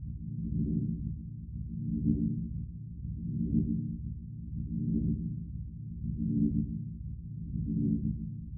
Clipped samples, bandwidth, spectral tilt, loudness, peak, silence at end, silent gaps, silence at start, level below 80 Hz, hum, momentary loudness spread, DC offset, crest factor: under 0.1%; 0.7 kHz; -13.5 dB/octave; -35 LUFS; -14 dBFS; 0 s; none; 0 s; -42 dBFS; none; 11 LU; under 0.1%; 20 dB